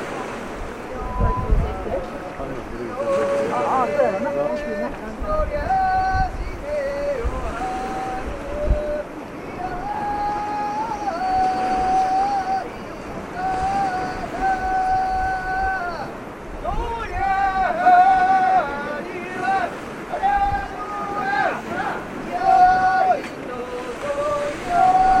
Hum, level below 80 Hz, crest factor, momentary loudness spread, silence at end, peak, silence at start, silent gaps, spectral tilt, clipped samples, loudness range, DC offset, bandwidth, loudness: none; -32 dBFS; 16 dB; 14 LU; 0 s; -4 dBFS; 0 s; none; -6 dB/octave; under 0.1%; 7 LU; under 0.1%; 12.5 kHz; -22 LUFS